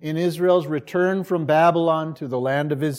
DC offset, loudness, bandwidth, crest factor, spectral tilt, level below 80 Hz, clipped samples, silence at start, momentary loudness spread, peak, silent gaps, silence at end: under 0.1%; -21 LUFS; 16 kHz; 16 dB; -7 dB/octave; -70 dBFS; under 0.1%; 0 s; 8 LU; -6 dBFS; none; 0 s